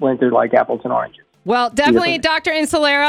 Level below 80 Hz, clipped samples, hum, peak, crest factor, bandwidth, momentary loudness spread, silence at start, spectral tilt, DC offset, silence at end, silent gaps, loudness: -50 dBFS; under 0.1%; none; -2 dBFS; 14 dB; 15.5 kHz; 7 LU; 0 s; -4 dB/octave; under 0.1%; 0 s; none; -16 LUFS